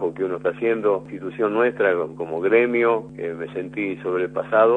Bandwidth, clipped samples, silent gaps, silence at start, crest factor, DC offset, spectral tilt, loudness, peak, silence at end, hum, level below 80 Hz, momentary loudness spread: 4 kHz; under 0.1%; none; 0 s; 18 dB; under 0.1%; -8 dB/octave; -22 LUFS; -4 dBFS; 0 s; 50 Hz at -45 dBFS; -62 dBFS; 11 LU